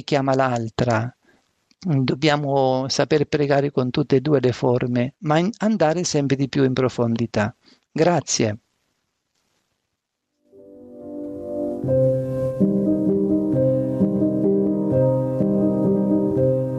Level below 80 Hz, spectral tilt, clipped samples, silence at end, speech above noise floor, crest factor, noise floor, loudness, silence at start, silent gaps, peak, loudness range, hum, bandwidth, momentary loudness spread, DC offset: -54 dBFS; -6 dB/octave; under 0.1%; 0 s; 58 dB; 16 dB; -78 dBFS; -20 LUFS; 0.1 s; none; -4 dBFS; 7 LU; none; 9 kHz; 6 LU; under 0.1%